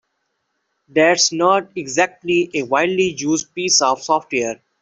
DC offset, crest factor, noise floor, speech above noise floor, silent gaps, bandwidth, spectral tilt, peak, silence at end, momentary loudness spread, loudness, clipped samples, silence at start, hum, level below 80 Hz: under 0.1%; 16 dB; -72 dBFS; 54 dB; none; 8.4 kHz; -2.5 dB/octave; -2 dBFS; 0.25 s; 8 LU; -17 LUFS; under 0.1%; 0.95 s; none; -60 dBFS